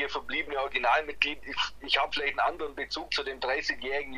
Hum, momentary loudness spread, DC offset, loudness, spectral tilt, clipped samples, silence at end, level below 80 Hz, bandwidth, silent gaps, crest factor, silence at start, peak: none; 6 LU; under 0.1%; -29 LUFS; -2 dB/octave; under 0.1%; 0 s; -54 dBFS; 15 kHz; none; 26 dB; 0 s; -6 dBFS